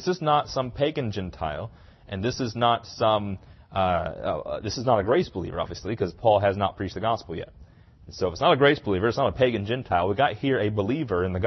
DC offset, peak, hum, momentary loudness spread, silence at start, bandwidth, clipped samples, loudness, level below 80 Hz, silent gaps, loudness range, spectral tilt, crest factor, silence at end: under 0.1%; -6 dBFS; none; 10 LU; 0 s; 6.2 kHz; under 0.1%; -25 LUFS; -50 dBFS; none; 4 LU; -6 dB/octave; 20 dB; 0 s